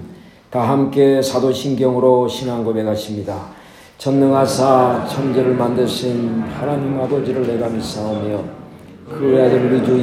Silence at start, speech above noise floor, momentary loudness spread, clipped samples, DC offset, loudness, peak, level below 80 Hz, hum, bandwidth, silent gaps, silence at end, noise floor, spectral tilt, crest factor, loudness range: 0 s; 23 dB; 12 LU; under 0.1%; under 0.1%; -17 LUFS; 0 dBFS; -54 dBFS; none; 15 kHz; none; 0 s; -39 dBFS; -6.5 dB/octave; 16 dB; 4 LU